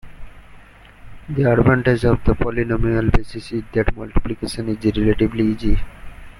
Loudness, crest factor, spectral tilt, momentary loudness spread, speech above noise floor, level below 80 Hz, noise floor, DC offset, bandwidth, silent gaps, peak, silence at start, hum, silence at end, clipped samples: -20 LUFS; 16 dB; -8 dB/octave; 11 LU; 26 dB; -26 dBFS; -43 dBFS; under 0.1%; 12 kHz; none; -2 dBFS; 0.05 s; none; 0.1 s; under 0.1%